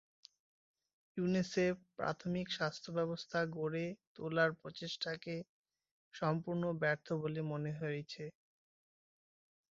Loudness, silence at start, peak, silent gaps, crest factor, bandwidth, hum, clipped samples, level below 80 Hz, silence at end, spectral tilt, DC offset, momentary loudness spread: -39 LUFS; 1.15 s; -18 dBFS; 4.07-4.15 s, 5.49-5.65 s, 5.91-6.11 s; 22 dB; 7.6 kHz; none; under 0.1%; -74 dBFS; 1.4 s; -4.5 dB/octave; under 0.1%; 12 LU